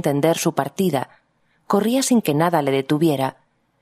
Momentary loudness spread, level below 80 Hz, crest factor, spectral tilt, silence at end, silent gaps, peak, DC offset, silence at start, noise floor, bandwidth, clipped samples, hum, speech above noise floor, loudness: 7 LU; -66 dBFS; 20 dB; -5.5 dB/octave; 0.5 s; none; 0 dBFS; under 0.1%; 0.05 s; -63 dBFS; 15.5 kHz; under 0.1%; none; 44 dB; -20 LUFS